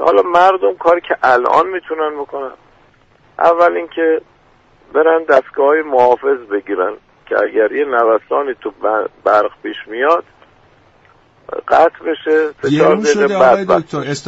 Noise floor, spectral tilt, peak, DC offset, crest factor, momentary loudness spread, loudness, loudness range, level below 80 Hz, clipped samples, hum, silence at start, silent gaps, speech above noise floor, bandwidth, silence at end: -50 dBFS; -5 dB/octave; 0 dBFS; under 0.1%; 14 dB; 10 LU; -14 LUFS; 4 LU; -54 dBFS; under 0.1%; none; 0 s; none; 37 dB; 8 kHz; 0 s